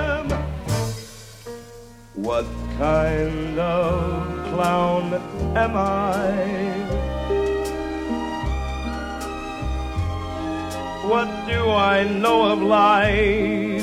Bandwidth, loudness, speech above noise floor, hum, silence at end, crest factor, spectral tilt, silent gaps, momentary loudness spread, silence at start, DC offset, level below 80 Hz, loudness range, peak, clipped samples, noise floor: 16 kHz; -22 LUFS; 22 dB; none; 0 s; 16 dB; -6 dB/octave; none; 12 LU; 0 s; under 0.1%; -34 dBFS; 7 LU; -4 dBFS; under 0.1%; -42 dBFS